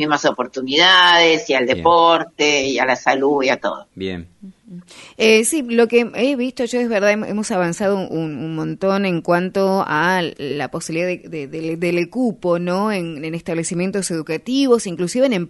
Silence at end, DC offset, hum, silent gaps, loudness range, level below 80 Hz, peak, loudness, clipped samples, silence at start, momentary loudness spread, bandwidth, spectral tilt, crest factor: 0 s; under 0.1%; none; none; 7 LU; -56 dBFS; 0 dBFS; -17 LUFS; under 0.1%; 0 s; 12 LU; 11.5 kHz; -4 dB/octave; 18 dB